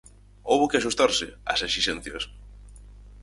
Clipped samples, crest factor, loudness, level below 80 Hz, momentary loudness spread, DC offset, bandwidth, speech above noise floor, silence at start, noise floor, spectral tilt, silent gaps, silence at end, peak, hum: under 0.1%; 20 dB; -25 LUFS; -48 dBFS; 13 LU; under 0.1%; 11.5 kHz; 21 dB; 0.45 s; -46 dBFS; -2.5 dB/octave; none; 0 s; -6 dBFS; 50 Hz at -45 dBFS